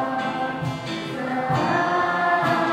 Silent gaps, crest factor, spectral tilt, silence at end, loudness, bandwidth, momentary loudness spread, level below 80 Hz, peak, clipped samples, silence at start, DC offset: none; 14 dB; -6 dB/octave; 0 s; -23 LUFS; 15.5 kHz; 8 LU; -56 dBFS; -8 dBFS; under 0.1%; 0 s; under 0.1%